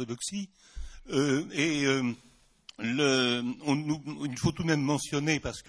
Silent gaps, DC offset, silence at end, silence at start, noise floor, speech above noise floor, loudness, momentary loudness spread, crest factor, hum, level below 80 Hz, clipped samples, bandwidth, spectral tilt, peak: none; under 0.1%; 0.05 s; 0 s; -56 dBFS; 26 dB; -29 LUFS; 14 LU; 18 dB; none; -52 dBFS; under 0.1%; 11 kHz; -4.5 dB/octave; -12 dBFS